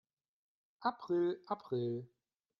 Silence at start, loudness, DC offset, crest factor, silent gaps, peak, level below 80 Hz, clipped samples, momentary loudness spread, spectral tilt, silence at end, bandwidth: 0.8 s; -38 LUFS; under 0.1%; 20 dB; none; -20 dBFS; -84 dBFS; under 0.1%; 7 LU; -9 dB/octave; 0.55 s; 6 kHz